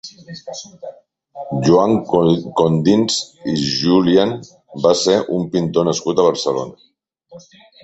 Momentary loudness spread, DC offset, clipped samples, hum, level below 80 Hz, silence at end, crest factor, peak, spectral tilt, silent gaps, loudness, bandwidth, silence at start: 19 LU; under 0.1%; under 0.1%; none; -52 dBFS; 0.45 s; 16 dB; 0 dBFS; -5.5 dB/octave; none; -16 LUFS; 8.2 kHz; 0.05 s